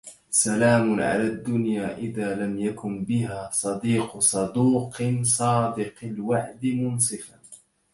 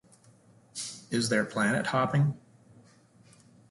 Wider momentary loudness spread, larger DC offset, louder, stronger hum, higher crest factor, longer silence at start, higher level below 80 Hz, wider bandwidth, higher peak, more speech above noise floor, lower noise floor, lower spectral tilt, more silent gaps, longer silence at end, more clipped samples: second, 9 LU vs 12 LU; neither; first, -24 LUFS vs -29 LUFS; neither; about the same, 18 dB vs 18 dB; second, 0.05 s vs 0.75 s; first, -58 dBFS vs -68 dBFS; about the same, 12 kHz vs 11.5 kHz; first, -6 dBFS vs -14 dBFS; second, 27 dB vs 32 dB; second, -51 dBFS vs -59 dBFS; about the same, -5 dB/octave vs -5 dB/octave; neither; second, 0.35 s vs 1.3 s; neither